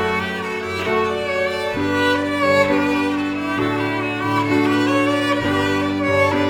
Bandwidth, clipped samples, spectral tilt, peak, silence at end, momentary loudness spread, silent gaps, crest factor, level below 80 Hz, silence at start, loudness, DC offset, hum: 17 kHz; under 0.1%; -5.5 dB/octave; -2 dBFS; 0 s; 5 LU; none; 18 dB; -50 dBFS; 0 s; -19 LUFS; under 0.1%; none